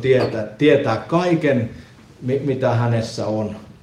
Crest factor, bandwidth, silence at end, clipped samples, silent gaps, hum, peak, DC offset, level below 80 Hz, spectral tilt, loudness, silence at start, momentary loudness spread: 16 dB; 10.5 kHz; 0.2 s; under 0.1%; none; none; -2 dBFS; under 0.1%; -52 dBFS; -7 dB/octave; -19 LUFS; 0 s; 9 LU